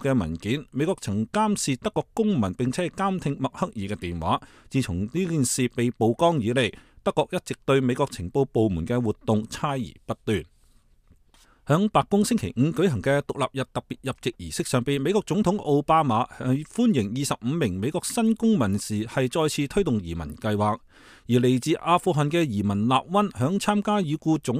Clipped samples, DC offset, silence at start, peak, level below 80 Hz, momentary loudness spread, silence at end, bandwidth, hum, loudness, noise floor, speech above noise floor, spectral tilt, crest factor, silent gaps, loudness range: under 0.1%; under 0.1%; 0 s; -6 dBFS; -50 dBFS; 8 LU; 0 s; 15.5 kHz; none; -25 LUFS; -58 dBFS; 34 dB; -6 dB/octave; 18 dB; none; 3 LU